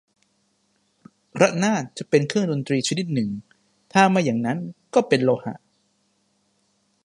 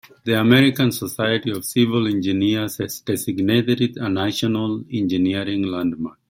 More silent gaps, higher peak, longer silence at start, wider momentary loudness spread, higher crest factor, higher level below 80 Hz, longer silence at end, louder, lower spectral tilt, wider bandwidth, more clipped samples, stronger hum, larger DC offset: neither; about the same, -2 dBFS vs -2 dBFS; first, 1.35 s vs 0.25 s; first, 12 LU vs 9 LU; about the same, 22 dB vs 18 dB; second, -68 dBFS vs -58 dBFS; first, 1.5 s vs 0.2 s; about the same, -22 LUFS vs -20 LUFS; about the same, -5.5 dB/octave vs -5.5 dB/octave; second, 11.5 kHz vs 16.5 kHz; neither; neither; neither